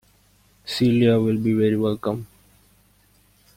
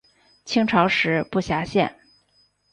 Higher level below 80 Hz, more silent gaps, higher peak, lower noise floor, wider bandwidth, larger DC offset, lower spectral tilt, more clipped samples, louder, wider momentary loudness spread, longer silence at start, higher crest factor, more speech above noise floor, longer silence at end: about the same, -56 dBFS vs -52 dBFS; neither; about the same, -6 dBFS vs -4 dBFS; second, -58 dBFS vs -63 dBFS; first, 16 kHz vs 10.5 kHz; neither; first, -7.5 dB/octave vs -5.5 dB/octave; neither; about the same, -21 LUFS vs -21 LUFS; first, 13 LU vs 6 LU; first, 0.65 s vs 0.45 s; about the same, 18 dB vs 20 dB; about the same, 39 dB vs 42 dB; first, 1.3 s vs 0.8 s